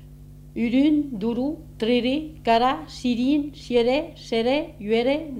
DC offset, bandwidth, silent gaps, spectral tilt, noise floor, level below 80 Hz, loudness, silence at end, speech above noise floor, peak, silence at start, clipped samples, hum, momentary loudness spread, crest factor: under 0.1%; 12.5 kHz; none; -6 dB/octave; -43 dBFS; -46 dBFS; -23 LUFS; 0 s; 21 dB; -6 dBFS; 0 s; under 0.1%; 50 Hz at -50 dBFS; 7 LU; 18 dB